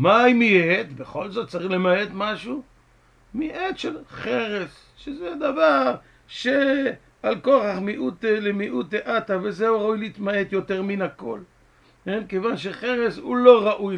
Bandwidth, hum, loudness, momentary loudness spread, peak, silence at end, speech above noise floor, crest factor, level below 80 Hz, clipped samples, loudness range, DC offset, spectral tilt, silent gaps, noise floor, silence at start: 9.4 kHz; none; -22 LUFS; 16 LU; 0 dBFS; 0 s; 35 dB; 22 dB; -58 dBFS; under 0.1%; 5 LU; under 0.1%; -6.5 dB/octave; none; -57 dBFS; 0 s